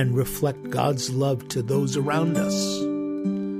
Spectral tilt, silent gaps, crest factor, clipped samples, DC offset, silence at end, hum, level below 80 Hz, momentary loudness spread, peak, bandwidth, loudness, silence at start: -5.5 dB/octave; none; 16 dB; under 0.1%; under 0.1%; 0 s; none; -54 dBFS; 4 LU; -8 dBFS; 15.5 kHz; -25 LUFS; 0 s